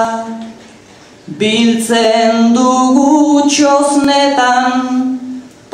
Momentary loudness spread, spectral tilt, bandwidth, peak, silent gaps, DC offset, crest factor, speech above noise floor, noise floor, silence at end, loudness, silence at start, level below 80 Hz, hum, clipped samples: 16 LU; -3.5 dB/octave; 14.5 kHz; 0 dBFS; none; under 0.1%; 10 dB; 29 dB; -39 dBFS; 0.25 s; -11 LUFS; 0 s; -54 dBFS; none; under 0.1%